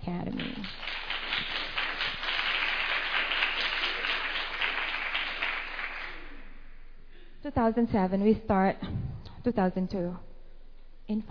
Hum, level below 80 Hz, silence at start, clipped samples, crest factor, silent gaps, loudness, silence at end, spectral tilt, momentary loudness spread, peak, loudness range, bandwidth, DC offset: none; -44 dBFS; 0 s; under 0.1%; 18 dB; none; -29 LUFS; 0 s; -6.5 dB/octave; 10 LU; -12 dBFS; 4 LU; 5.4 kHz; under 0.1%